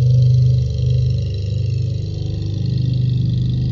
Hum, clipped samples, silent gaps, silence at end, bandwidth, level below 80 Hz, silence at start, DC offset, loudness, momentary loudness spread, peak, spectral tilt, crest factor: 50 Hz at -25 dBFS; under 0.1%; none; 0 s; 6.6 kHz; -28 dBFS; 0 s; under 0.1%; -18 LUFS; 9 LU; -6 dBFS; -9 dB/octave; 10 dB